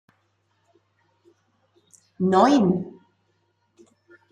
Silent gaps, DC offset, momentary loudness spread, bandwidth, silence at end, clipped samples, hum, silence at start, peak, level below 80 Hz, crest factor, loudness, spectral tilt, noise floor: none; under 0.1%; 13 LU; 9.8 kHz; 1.4 s; under 0.1%; none; 2.2 s; -4 dBFS; -68 dBFS; 22 dB; -20 LUFS; -7 dB/octave; -69 dBFS